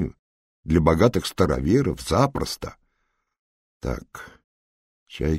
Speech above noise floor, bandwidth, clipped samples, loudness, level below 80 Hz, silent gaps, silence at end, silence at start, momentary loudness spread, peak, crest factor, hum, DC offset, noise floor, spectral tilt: 52 dB; 16 kHz; under 0.1%; -23 LUFS; -38 dBFS; 0.19-0.63 s, 3.39-3.80 s, 4.44-5.06 s; 0 s; 0 s; 21 LU; -4 dBFS; 22 dB; none; under 0.1%; -74 dBFS; -6.5 dB/octave